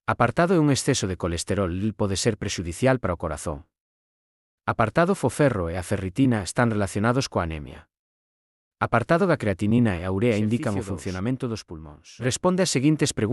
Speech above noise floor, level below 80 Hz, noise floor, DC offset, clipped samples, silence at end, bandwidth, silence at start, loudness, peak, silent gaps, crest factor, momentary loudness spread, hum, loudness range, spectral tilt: over 67 dB; -50 dBFS; under -90 dBFS; under 0.1%; under 0.1%; 0 s; 12 kHz; 0.1 s; -24 LUFS; -6 dBFS; 3.80-4.58 s, 7.99-8.71 s; 18 dB; 10 LU; none; 3 LU; -5.5 dB/octave